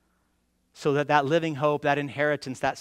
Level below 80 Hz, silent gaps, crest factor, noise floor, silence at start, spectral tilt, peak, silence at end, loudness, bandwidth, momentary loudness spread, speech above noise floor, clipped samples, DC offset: -66 dBFS; none; 20 dB; -71 dBFS; 0.75 s; -6 dB/octave; -6 dBFS; 0 s; -25 LUFS; 14.5 kHz; 6 LU; 46 dB; under 0.1%; under 0.1%